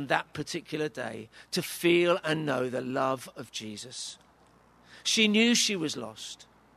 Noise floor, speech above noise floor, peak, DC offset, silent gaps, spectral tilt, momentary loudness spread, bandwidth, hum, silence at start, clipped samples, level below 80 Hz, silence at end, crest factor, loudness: -60 dBFS; 31 dB; -8 dBFS; under 0.1%; none; -3 dB/octave; 16 LU; 13.5 kHz; none; 0 s; under 0.1%; -70 dBFS; 0.35 s; 22 dB; -28 LUFS